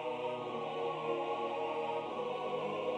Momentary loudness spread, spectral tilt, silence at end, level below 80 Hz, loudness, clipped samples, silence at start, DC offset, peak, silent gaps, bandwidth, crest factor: 2 LU; -5.5 dB/octave; 0 s; -80 dBFS; -38 LUFS; under 0.1%; 0 s; under 0.1%; -22 dBFS; none; 9.6 kHz; 14 dB